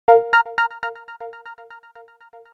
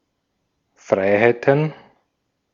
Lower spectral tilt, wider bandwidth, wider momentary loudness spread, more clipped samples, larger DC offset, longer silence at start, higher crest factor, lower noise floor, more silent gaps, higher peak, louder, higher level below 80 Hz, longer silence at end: second, -3 dB/octave vs -7.5 dB/octave; about the same, 7.4 kHz vs 7.4 kHz; first, 25 LU vs 7 LU; neither; neither; second, 0.1 s vs 0.9 s; about the same, 20 dB vs 20 dB; second, -47 dBFS vs -73 dBFS; neither; about the same, 0 dBFS vs -2 dBFS; about the same, -18 LUFS vs -18 LUFS; about the same, -64 dBFS vs -68 dBFS; about the same, 0.8 s vs 0.8 s